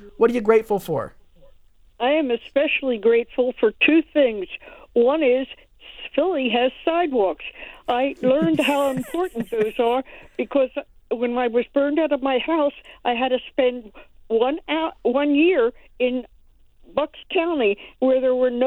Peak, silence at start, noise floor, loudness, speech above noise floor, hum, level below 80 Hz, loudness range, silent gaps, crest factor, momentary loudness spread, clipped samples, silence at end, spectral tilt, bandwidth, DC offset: -4 dBFS; 0 s; -52 dBFS; -21 LUFS; 31 dB; none; -52 dBFS; 3 LU; none; 18 dB; 11 LU; under 0.1%; 0 s; -5.5 dB/octave; 15.5 kHz; under 0.1%